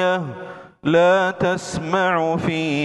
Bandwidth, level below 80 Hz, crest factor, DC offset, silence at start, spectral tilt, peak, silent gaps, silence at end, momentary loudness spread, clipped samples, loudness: 11.5 kHz; -52 dBFS; 14 dB; under 0.1%; 0 s; -5.5 dB/octave; -6 dBFS; none; 0 s; 14 LU; under 0.1%; -19 LUFS